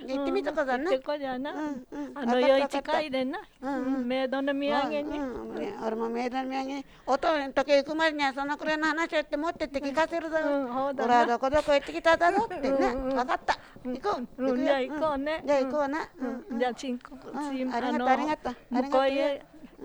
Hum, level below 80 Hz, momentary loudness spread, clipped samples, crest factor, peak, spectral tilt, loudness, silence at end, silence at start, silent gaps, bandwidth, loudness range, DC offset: none; -54 dBFS; 10 LU; under 0.1%; 18 dB; -10 dBFS; -4 dB/octave; -28 LUFS; 0 s; 0 s; none; over 20 kHz; 4 LU; under 0.1%